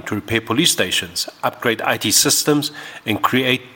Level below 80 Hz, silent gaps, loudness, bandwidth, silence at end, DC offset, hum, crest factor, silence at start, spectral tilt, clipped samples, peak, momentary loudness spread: -54 dBFS; none; -17 LUFS; 17 kHz; 0.05 s; under 0.1%; none; 18 dB; 0.05 s; -2.5 dB/octave; under 0.1%; 0 dBFS; 10 LU